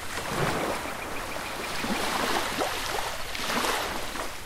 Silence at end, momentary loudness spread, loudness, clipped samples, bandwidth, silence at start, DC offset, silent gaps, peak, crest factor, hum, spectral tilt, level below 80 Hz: 0 s; 7 LU; -29 LUFS; under 0.1%; 16 kHz; 0 s; under 0.1%; none; -12 dBFS; 16 dB; none; -2.5 dB/octave; -46 dBFS